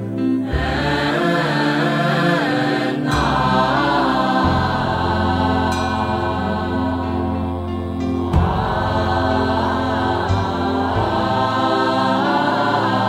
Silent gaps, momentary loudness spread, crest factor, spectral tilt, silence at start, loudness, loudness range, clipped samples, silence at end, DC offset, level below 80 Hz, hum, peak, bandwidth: none; 4 LU; 14 dB; -6.5 dB/octave; 0 s; -18 LUFS; 3 LU; under 0.1%; 0 s; under 0.1%; -34 dBFS; none; -4 dBFS; 16 kHz